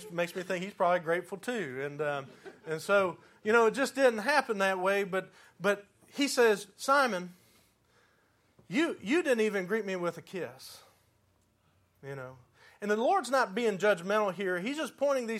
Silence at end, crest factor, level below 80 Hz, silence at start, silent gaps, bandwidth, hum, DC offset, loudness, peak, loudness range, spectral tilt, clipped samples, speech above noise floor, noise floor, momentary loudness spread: 0 s; 20 dB; -80 dBFS; 0 s; none; 15.5 kHz; none; under 0.1%; -30 LUFS; -10 dBFS; 6 LU; -4 dB/octave; under 0.1%; 40 dB; -70 dBFS; 15 LU